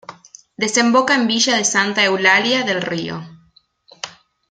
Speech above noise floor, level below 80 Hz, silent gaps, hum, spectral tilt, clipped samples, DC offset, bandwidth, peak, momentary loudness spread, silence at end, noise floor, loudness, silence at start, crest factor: 39 dB; -64 dBFS; none; none; -2 dB/octave; under 0.1%; under 0.1%; 9.6 kHz; -2 dBFS; 19 LU; 0.4 s; -55 dBFS; -15 LUFS; 0.1 s; 18 dB